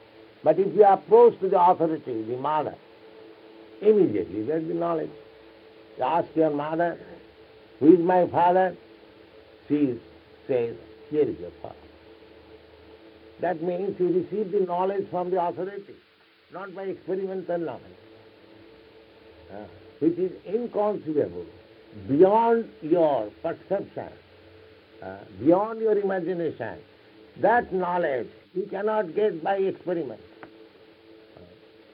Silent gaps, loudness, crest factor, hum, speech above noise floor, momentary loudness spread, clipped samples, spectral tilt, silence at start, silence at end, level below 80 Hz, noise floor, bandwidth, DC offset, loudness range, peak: none; -24 LUFS; 22 dB; none; 28 dB; 22 LU; under 0.1%; -10.5 dB/octave; 0.45 s; 0.5 s; -66 dBFS; -52 dBFS; 5.2 kHz; under 0.1%; 9 LU; -4 dBFS